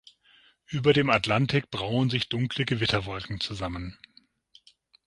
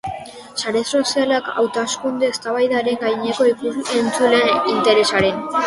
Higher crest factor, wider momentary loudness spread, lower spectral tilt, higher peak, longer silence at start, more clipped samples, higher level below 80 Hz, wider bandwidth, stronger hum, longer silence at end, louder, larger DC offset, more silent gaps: about the same, 22 dB vs 18 dB; first, 12 LU vs 7 LU; first, -6 dB/octave vs -3 dB/octave; second, -6 dBFS vs 0 dBFS; first, 0.7 s vs 0.05 s; neither; about the same, -52 dBFS vs -54 dBFS; about the same, 11.5 kHz vs 11.5 kHz; neither; first, 1.15 s vs 0 s; second, -26 LUFS vs -18 LUFS; neither; neither